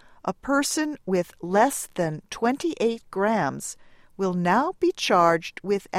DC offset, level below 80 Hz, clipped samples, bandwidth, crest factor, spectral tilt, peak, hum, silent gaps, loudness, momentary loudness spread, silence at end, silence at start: under 0.1%; -58 dBFS; under 0.1%; 16 kHz; 18 dB; -4.5 dB/octave; -6 dBFS; none; none; -24 LUFS; 9 LU; 0 s; 0.25 s